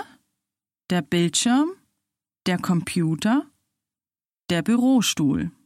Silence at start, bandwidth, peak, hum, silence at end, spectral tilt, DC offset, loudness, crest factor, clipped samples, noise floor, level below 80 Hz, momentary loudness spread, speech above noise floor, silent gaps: 0 s; 15 kHz; -8 dBFS; none; 0.15 s; -4.5 dB/octave; under 0.1%; -22 LUFS; 16 dB; under 0.1%; under -90 dBFS; -58 dBFS; 8 LU; over 69 dB; none